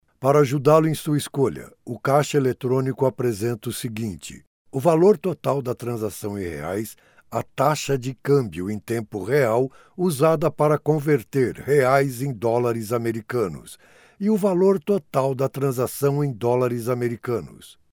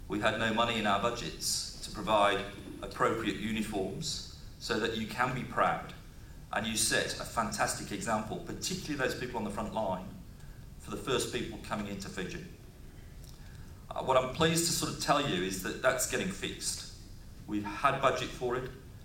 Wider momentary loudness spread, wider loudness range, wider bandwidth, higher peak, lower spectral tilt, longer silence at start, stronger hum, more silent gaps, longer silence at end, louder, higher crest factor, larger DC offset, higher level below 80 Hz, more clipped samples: second, 11 LU vs 22 LU; second, 3 LU vs 6 LU; first, 19.5 kHz vs 17 kHz; first, -4 dBFS vs -12 dBFS; first, -6.5 dB/octave vs -3.5 dB/octave; first, 0.2 s vs 0 s; neither; first, 4.47-4.65 s vs none; first, 0.2 s vs 0 s; first, -22 LUFS vs -32 LUFS; about the same, 18 dB vs 22 dB; neither; second, -58 dBFS vs -50 dBFS; neither